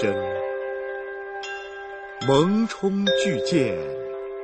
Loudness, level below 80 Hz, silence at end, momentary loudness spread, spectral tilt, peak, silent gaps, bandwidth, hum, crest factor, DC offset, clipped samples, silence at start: -24 LUFS; -58 dBFS; 0 s; 13 LU; -5.5 dB/octave; -6 dBFS; none; 8.8 kHz; none; 18 dB; under 0.1%; under 0.1%; 0 s